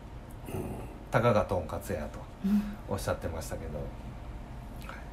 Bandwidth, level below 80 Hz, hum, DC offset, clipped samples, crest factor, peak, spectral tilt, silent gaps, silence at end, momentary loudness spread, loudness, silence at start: 16 kHz; -44 dBFS; none; under 0.1%; under 0.1%; 22 dB; -10 dBFS; -6.5 dB/octave; none; 0 s; 17 LU; -33 LUFS; 0 s